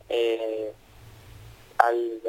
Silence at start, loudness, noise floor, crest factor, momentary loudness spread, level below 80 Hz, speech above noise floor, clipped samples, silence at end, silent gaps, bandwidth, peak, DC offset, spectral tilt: 0.1 s; -26 LUFS; -49 dBFS; 26 dB; 14 LU; -58 dBFS; 22 dB; under 0.1%; 0 s; none; 17 kHz; -2 dBFS; under 0.1%; -5 dB/octave